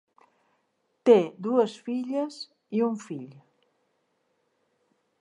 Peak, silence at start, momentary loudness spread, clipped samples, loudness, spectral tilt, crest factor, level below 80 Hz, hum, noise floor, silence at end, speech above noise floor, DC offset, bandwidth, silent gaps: -6 dBFS; 1.05 s; 19 LU; under 0.1%; -26 LUFS; -6.5 dB/octave; 24 dB; -86 dBFS; none; -74 dBFS; 1.9 s; 49 dB; under 0.1%; 10 kHz; none